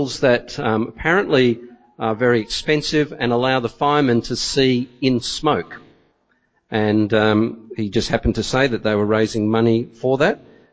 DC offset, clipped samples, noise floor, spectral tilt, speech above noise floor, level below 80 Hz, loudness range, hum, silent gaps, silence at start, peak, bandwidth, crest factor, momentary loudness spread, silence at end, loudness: under 0.1%; under 0.1%; -64 dBFS; -5.5 dB/octave; 46 dB; -42 dBFS; 2 LU; none; none; 0 s; -2 dBFS; 8 kHz; 16 dB; 6 LU; 0.35 s; -19 LUFS